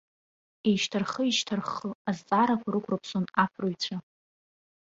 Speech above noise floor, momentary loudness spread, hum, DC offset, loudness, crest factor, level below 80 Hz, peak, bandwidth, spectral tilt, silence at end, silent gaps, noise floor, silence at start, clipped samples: over 62 dB; 8 LU; none; under 0.1%; -29 LUFS; 20 dB; -70 dBFS; -10 dBFS; 7.8 kHz; -4.5 dB/octave; 0.95 s; 1.95-2.05 s; under -90 dBFS; 0.65 s; under 0.1%